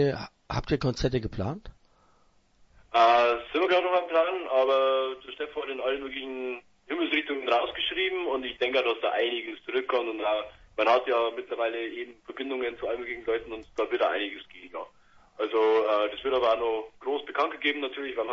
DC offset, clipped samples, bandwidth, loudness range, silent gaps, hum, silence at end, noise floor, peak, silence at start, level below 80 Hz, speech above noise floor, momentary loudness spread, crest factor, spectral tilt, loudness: under 0.1%; under 0.1%; 7.6 kHz; 6 LU; none; none; 0 s; -64 dBFS; -8 dBFS; 0 s; -52 dBFS; 36 dB; 13 LU; 20 dB; -6 dB/octave; -28 LUFS